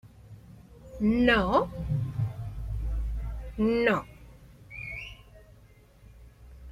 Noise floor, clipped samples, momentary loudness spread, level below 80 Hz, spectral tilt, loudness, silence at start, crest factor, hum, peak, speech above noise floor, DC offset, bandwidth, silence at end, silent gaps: -56 dBFS; under 0.1%; 22 LU; -40 dBFS; -7.5 dB/octave; -28 LUFS; 0.05 s; 22 dB; none; -8 dBFS; 31 dB; under 0.1%; 14 kHz; 0 s; none